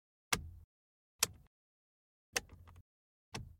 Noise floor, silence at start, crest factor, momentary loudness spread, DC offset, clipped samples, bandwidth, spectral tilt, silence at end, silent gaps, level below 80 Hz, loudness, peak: under -90 dBFS; 0.3 s; 32 dB; 21 LU; under 0.1%; under 0.1%; 16.5 kHz; -1 dB/octave; 0.1 s; 0.64-1.19 s, 1.47-2.33 s, 2.81-3.32 s; -62 dBFS; -39 LUFS; -12 dBFS